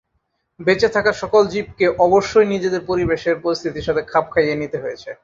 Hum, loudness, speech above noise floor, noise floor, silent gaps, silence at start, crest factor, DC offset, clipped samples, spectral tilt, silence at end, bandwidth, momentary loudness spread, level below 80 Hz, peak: none; -18 LUFS; 52 dB; -70 dBFS; none; 0.6 s; 16 dB; under 0.1%; under 0.1%; -5.5 dB/octave; 0.1 s; 7.6 kHz; 8 LU; -46 dBFS; -2 dBFS